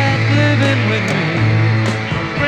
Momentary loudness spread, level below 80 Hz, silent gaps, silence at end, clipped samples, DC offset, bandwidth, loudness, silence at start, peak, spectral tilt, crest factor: 5 LU; -40 dBFS; none; 0 s; under 0.1%; under 0.1%; 9 kHz; -15 LUFS; 0 s; 0 dBFS; -6.5 dB/octave; 14 dB